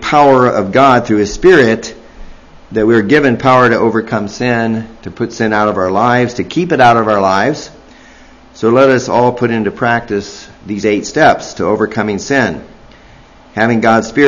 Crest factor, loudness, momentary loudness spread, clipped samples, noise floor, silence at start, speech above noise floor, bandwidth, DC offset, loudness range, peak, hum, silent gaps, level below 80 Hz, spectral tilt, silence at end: 12 dB; -11 LUFS; 12 LU; 0.4%; -40 dBFS; 0 s; 29 dB; 8.4 kHz; under 0.1%; 3 LU; 0 dBFS; none; none; -40 dBFS; -5.5 dB/octave; 0 s